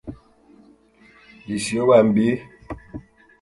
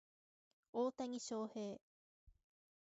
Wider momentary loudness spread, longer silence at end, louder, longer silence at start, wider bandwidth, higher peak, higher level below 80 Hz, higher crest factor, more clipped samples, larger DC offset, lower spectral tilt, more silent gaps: first, 25 LU vs 8 LU; second, 0.4 s vs 0.6 s; first, -19 LUFS vs -45 LUFS; second, 0.05 s vs 0.75 s; first, 11.5 kHz vs 7.6 kHz; first, -2 dBFS vs -30 dBFS; first, -50 dBFS vs -82 dBFS; about the same, 20 dB vs 18 dB; neither; neither; about the same, -6 dB/octave vs -5 dB/octave; second, none vs 1.81-2.27 s